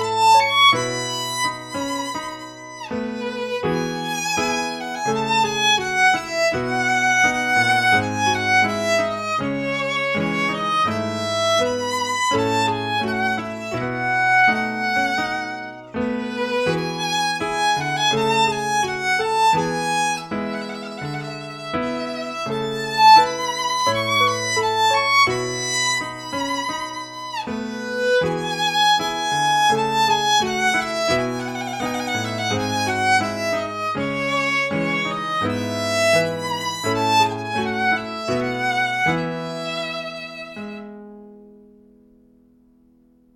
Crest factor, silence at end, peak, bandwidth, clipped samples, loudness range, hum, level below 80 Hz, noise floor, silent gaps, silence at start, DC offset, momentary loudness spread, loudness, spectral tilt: 18 dB; 1.85 s; -2 dBFS; 17 kHz; under 0.1%; 7 LU; none; -56 dBFS; -55 dBFS; none; 0 s; under 0.1%; 11 LU; -20 LUFS; -3 dB/octave